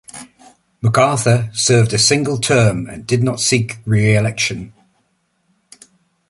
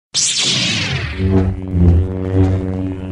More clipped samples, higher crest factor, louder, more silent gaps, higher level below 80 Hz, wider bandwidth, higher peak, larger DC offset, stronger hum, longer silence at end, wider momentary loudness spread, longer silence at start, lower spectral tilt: neither; about the same, 16 dB vs 14 dB; about the same, -15 LUFS vs -16 LUFS; neither; second, -46 dBFS vs -26 dBFS; about the same, 11.5 kHz vs 11 kHz; about the same, -2 dBFS vs -2 dBFS; neither; neither; first, 1.6 s vs 0 s; about the same, 8 LU vs 6 LU; about the same, 0.15 s vs 0.15 s; about the same, -4.5 dB/octave vs -4 dB/octave